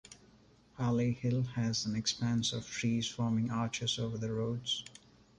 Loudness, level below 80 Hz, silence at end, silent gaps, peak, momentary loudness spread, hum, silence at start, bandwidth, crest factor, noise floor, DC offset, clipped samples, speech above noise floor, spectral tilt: -34 LUFS; -62 dBFS; 0.5 s; none; -20 dBFS; 4 LU; none; 0.1 s; 10.5 kHz; 16 dB; -63 dBFS; under 0.1%; under 0.1%; 29 dB; -5 dB/octave